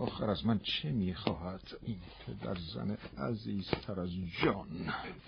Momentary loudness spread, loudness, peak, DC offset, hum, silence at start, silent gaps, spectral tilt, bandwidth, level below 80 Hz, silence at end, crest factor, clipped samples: 11 LU; -37 LUFS; -12 dBFS; under 0.1%; none; 0 s; none; -5 dB/octave; 6.2 kHz; -56 dBFS; 0 s; 24 dB; under 0.1%